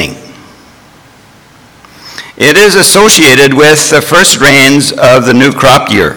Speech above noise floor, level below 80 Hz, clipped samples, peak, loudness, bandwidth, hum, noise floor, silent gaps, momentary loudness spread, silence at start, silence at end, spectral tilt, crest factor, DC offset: 34 dB; -36 dBFS; 8%; 0 dBFS; -3 LUFS; over 20 kHz; none; -38 dBFS; none; 5 LU; 0 s; 0 s; -3 dB/octave; 6 dB; under 0.1%